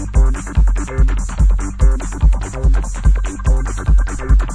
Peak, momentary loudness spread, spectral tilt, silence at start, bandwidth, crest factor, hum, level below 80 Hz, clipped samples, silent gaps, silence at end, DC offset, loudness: -2 dBFS; 2 LU; -6.5 dB/octave; 0 s; 10 kHz; 12 dB; none; -14 dBFS; under 0.1%; none; 0 s; under 0.1%; -18 LUFS